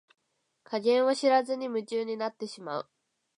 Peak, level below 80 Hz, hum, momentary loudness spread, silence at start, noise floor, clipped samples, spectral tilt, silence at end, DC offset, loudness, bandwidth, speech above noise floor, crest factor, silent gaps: -12 dBFS; -86 dBFS; none; 13 LU; 0.7 s; -64 dBFS; under 0.1%; -4 dB/octave; 0.55 s; under 0.1%; -29 LUFS; 11 kHz; 36 dB; 18 dB; none